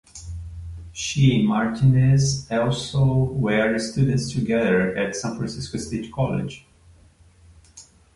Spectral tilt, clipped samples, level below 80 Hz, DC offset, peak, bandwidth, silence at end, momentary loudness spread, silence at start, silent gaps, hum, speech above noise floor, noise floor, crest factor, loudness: -6 dB/octave; under 0.1%; -44 dBFS; under 0.1%; -6 dBFS; 11.5 kHz; 0.35 s; 18 LU; 0.15 s; none; none; 32 dB; -53 dBFS; 16 dB; -22 LUFS